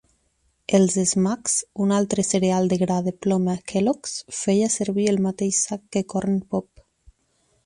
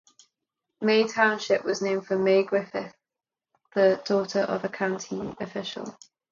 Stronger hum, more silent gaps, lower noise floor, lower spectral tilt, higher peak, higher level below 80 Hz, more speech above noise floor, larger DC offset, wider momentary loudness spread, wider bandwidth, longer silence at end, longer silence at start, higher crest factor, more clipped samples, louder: neither; neither; second, -68 dBFS vs -90 dBFS; about the same, -5 dB/octave vs -4.5 dB/octave; about the same, -6 dBFS vs -6 dBFS; first, -58 dBFS vs -70 dBFS; second, 46 dB vs 65 dB; neither; second, 7 LU vs 13 LU; first, 11.5 kHz vs 7.4 kHz; first, 1.05 s vs 0.4 s; about the same, 0.7 s vs 0.8 s; about the same, 18 dB vs 20 dB; neither; first, -22 LUFS vs -26 LUFS